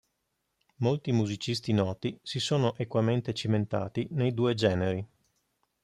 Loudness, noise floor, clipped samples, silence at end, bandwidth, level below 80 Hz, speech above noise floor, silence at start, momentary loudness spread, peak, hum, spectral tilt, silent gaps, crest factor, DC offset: -29 LUFS; -80 dBFS; under 0.1%; 0.8 s; 11.5 kHz; -64 dBFS; 51 dB; 0.8 s; 6 LU; -12 dBFS; none; -6.5 dB/octave; none; 18 dB; under 0.1%